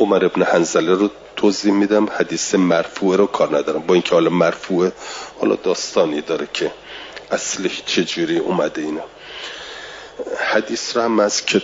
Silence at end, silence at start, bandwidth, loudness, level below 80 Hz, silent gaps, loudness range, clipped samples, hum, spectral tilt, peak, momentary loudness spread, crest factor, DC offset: 0 s; 0 s; 7.8 kHz; -18 LUFS; -58 dBFS; none; 5 LU; under 0.1%; none; -4 dB/octave; -2 dBFS; 14 LU; 16 dB; under 0.1%